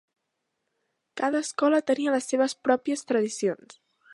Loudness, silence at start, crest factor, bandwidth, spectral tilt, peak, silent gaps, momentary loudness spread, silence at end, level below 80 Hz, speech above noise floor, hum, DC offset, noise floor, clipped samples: -26 LUFS; 1.15 s; 20 dB; 11.5 kHz; -3.5 dB/octave; -6 dBFS; none; 6 LU; 0.6 s; -80 dBFS; 55 dB; none; under 0.1%; -80 dBFS; under 0.1%